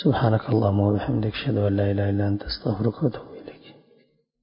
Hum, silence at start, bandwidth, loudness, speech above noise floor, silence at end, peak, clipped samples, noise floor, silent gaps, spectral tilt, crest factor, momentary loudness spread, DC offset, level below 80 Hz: none; 0 s; 5.4 kHz; -24 LUFS; 40 dB; 0.7 s; -6 dBFS; under 0.1%; -62 dBFS; none; -12 dB/octave; 18 dB; 13 LU; under 0.1%; -44 dBFS